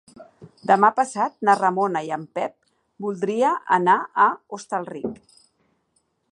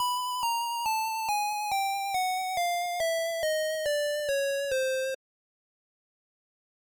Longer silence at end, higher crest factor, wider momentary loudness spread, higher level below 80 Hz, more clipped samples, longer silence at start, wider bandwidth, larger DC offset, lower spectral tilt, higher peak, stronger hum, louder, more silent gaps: second, 1.15 s vs 1.7 s; first, 20 dB vs 8 dB; first, 14 LU vs 1 LU; about the same, -70 dBFS vs -66 dBFS; neither; first, 0.2 s vs 0 s; second, 11.5 kHz vs over 20 kHz; neither; first, -5.5 dB/octave vs 1 dB/octave; first, -2 dBFS vs -22 dBFS; neither; first, -21 LUFS vs -29 LUFS; neither